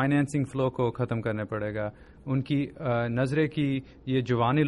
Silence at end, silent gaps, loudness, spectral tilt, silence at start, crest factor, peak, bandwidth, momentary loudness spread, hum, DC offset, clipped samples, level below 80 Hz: 0 s; none; -29 LUFS; -7.5 dB/octave; 0 s; 16 dB; -12 dBFS; 11.5 kHz; 7 LU; none; under 0.1%; under 0.1%; -54 dBFS